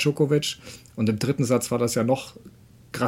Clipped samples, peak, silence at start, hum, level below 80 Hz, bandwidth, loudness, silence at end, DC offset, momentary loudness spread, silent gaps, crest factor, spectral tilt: under 0.1%; -8 dBFS; 0 s; none; -58 dBFS; 16.5 kHz; -24 LUFS; 0 s; under 0.1%; 16 LU; none; 16 dB; -5.5 dB/octave